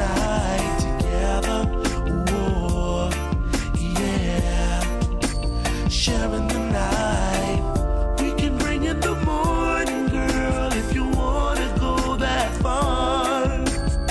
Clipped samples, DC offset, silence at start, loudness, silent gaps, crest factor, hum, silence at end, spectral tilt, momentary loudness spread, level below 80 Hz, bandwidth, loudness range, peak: under 0.1%; under 0.1%; 0 s; -23 LUFS; none; 12 dB; none; 0 s; -5 dB/octave; 3 LU; -26 dBFS; 11 kHz; 1 LU; -8 dBFS